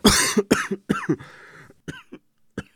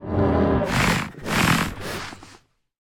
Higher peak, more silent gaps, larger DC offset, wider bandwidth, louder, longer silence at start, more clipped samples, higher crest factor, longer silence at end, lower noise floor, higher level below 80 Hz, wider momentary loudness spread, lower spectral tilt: first, 0 dBFS vs -6 dBFS; neither; neither; about the same, over 20 kHz vs 19.5 kHz; about the same, -22 LUFS vs -22 LUFS; about the same, 0.05 s vs 0 s; neither; first, 24 dB vs 16 dB; second, 0.15 s vs 0.5 s; second, -48 dBFS vs -53 dBFS; about the same, -42 dBFS vs -38 dBFS; first, 22 LU vs 12 LU; second, -3 dB/octave vs -5 dB/octave